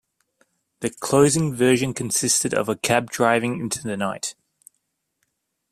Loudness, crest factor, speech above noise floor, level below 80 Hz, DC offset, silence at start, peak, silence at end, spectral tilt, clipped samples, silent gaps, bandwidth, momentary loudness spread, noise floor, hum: -21 LUFS; 20 dB; 53 dB; -58 dBFS; under 0.1%; 0.8 s; -2 dBFS; 1.4 s; -4 dB/octave; under 0.1%; none; 15 kHz; 11 LU; -75 dBFS; none